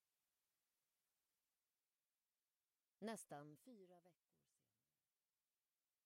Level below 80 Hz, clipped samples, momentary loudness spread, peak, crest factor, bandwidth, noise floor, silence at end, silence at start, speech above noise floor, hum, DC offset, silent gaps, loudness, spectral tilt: under -90 dBFS; under 0.1%; 13 LU; -38 dBFS; 26 dB; 15.5 kHz; under -90 dBFS; 1.95 s; 3 s; over 32 dB; none; under 0.1%; none; -57 LUFS; -4.5 dB/octave